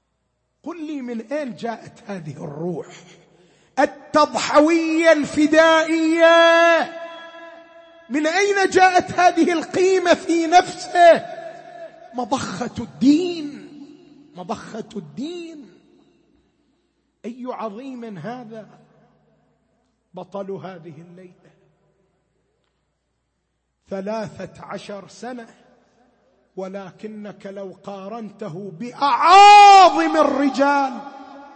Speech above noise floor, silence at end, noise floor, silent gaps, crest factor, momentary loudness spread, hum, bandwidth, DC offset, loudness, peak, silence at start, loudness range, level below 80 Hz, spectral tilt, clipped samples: 55 dB; 0.15 s; -72 dBFS; none; 16 dB; 23 LU; none; 8.8 kHz; under 0.1%; -15 LUFS; -2 dBFS; 0.65 s; 22 LU; -62 dBFS; -3.5 dB/octave; under 0.1%